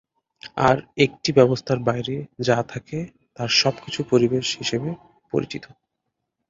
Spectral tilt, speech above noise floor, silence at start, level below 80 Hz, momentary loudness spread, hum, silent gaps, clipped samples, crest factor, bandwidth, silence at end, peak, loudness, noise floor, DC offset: -5 dB/octave; 57 dB; 0.45 s; -56 dBFS; 15 LU; none; none; under 0.1%; 22 dB; 7.8 kHz; 0.85 s; -2 dBFS; -22 LUFS; -79 dBFS; under 0.1%